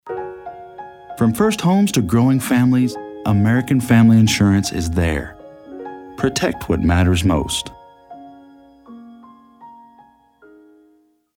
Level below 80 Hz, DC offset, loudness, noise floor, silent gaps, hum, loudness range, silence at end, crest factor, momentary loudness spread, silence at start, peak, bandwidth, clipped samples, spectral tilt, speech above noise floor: -36 dBFS; under 0.1%; -17 LUFS; -57 dBFS; none; none; 7 LU; 1.65 s; 16 dB; 22 LU; 0.05 s; -2 dBFS; 17.5 kHz; under 0.1%; -6 dB/octave; 42 dB